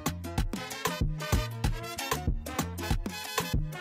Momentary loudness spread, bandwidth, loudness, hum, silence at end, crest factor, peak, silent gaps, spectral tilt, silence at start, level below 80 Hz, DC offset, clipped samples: 4 LU; 16.5 kHz; -33 LUFS; none; 0 s; 18 dB; -14 dBFS; none; -4.5 dB/octave; 0 s; -36 dBFS; under 0.1%; under 0.1%